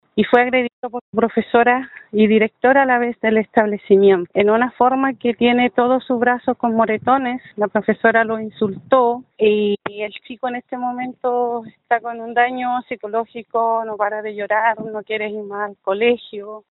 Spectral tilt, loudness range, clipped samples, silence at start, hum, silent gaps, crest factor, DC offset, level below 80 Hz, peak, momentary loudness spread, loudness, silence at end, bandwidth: -3.5 dB/octave; 6 LU; under 0.1%; 0.15 s; none; 0.73-0.83 s, 1.01-1.13 s; 18 dB; under 0.1%; -60 dBFS; 0 dBFS; 10 LU; -18 LUFS; 0.1 s; 4.1 kHz